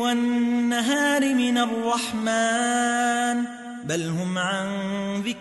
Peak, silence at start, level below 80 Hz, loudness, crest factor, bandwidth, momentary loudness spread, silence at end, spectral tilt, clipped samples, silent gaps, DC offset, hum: -10 dBFS; 0 s; -66 dBFS; -23 LUFS; 12 dB; 12 kHz; 7 LU; 0 s; -4 dB/octave; under 0.1%; none; under 0.1%; none